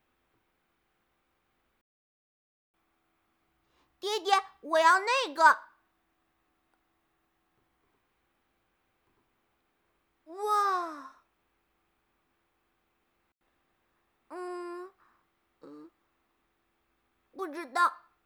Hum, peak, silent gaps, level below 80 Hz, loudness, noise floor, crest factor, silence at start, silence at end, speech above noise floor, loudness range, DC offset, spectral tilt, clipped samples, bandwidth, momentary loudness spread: none; -8 dBFS; none; -86 dBFS; -27 LUFS; -77 dBFS; 26 dB; 4.05 s; 0.3 s; 49 dB; 20 LU; under 0.1%; 0 dB/octave; under 0.1%; over 20 kHz; 20 LU